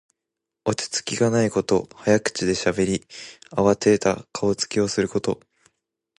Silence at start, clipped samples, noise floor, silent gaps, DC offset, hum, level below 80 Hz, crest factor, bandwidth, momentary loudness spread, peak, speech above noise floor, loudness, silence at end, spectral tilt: 0.65 s; under 0.1%; -84 dBFS; none; under 0.1%; none; -52 dBFS; 20 dB; 11.5 kHz; 10 LU; -4 dBFS; 62 dB; -22 LUFS; 0.85 s; -4.5 dB/octave